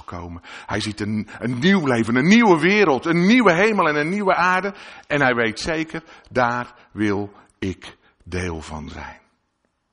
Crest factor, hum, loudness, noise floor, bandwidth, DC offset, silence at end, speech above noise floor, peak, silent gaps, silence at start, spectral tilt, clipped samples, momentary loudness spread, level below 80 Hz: 18 dB; none; -19 LUFS; -71 dBFS; 10.5 kHz; under 0.1%; 0.8 s; 51 dB; -2 dBFS; none; 0.1 s; -5.5 dB/octave; under 0.1%; 20 LU; -48 dBFS